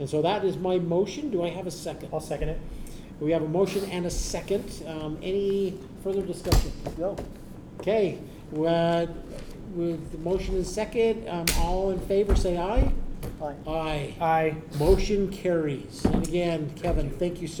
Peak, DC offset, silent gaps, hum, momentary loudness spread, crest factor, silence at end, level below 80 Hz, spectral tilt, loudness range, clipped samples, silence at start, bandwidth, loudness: -6 dBFS; under 0.1%; none; none; 11 LU; 22 dB; 0 s; -34 dBFS; -5.5 dB/octave; 3 LU; under 0.1%; 0 s; over 20 kHz; -28 LUFS